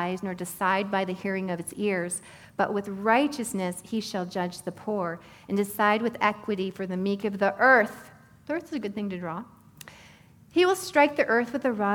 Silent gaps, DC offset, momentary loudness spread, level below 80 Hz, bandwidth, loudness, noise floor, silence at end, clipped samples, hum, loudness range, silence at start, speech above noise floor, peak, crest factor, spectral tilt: none; under 0.1%; 12 LU; -66 dBFS; 19 kHz; -27 LUFS; -54 dBFS; 0 s; under 0.1%; none; 4 LU; 0 s; 27 dB; -6 dBFS; 22 dB; -4.5 dB/octave